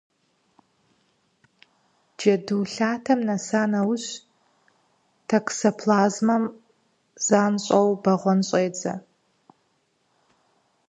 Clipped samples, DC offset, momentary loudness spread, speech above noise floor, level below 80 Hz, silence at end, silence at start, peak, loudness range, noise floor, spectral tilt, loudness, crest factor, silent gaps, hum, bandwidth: under 0.1%; under 0.1%; 10 LU; 47 dB; -74 dBFS; 1.9 s; 2.2 s; -4 dBFS; 4 LU; -69 dBFS; -5 dB/octave; -23 LUFS; 20 dB; none; none; 9 kHz